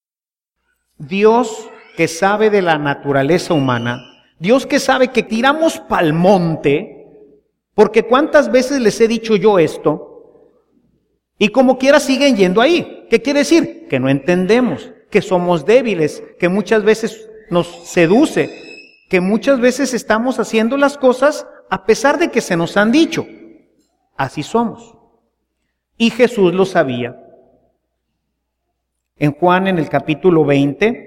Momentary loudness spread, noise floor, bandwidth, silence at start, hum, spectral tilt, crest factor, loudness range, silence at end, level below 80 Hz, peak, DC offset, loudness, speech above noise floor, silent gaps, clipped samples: 9 LU; under -90 dBFS; 16 kHz; 1 s; none; -5.5 dB/octave; 16 dB; 4 LU; 0.05 s; -50 dBFS; 0 dBFS; under 0.1%; -14 LUFS; over 76 dB; none; under 0.1%